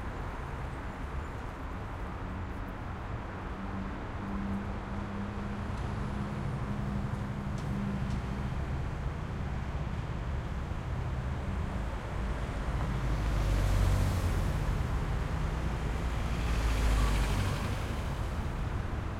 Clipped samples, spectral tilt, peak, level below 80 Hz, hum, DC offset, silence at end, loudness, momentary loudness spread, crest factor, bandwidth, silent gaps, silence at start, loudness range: under 0.1%; -6.5 dB/octave; -16 dBFS; -36 dBFS; none; under 0.1%; 0 s; -35 LUFS; 9 LU; 16 dB; 15.5 kHz; none; 0 s; 6 LU